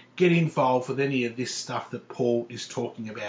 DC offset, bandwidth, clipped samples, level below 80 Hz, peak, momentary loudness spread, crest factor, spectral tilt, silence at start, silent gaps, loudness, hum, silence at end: under 0.1%; 8 kHz; under 0.1%; -74 dBFS; -10 dBFS; 12 LU; 18 dB; -5.5 dB/octave; 0.15 s; none; -27 LUFS; none; 0 s